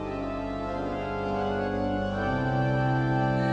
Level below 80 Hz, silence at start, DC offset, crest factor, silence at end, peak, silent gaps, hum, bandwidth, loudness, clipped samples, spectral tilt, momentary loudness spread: -44 dBFS; 0 s; under 0.1%; 12 dB; 0 s; -14 dBFS; none; none; 7.6 kHz; -28 LUFS; under 0.1%; -8 dB/octave; 7 LU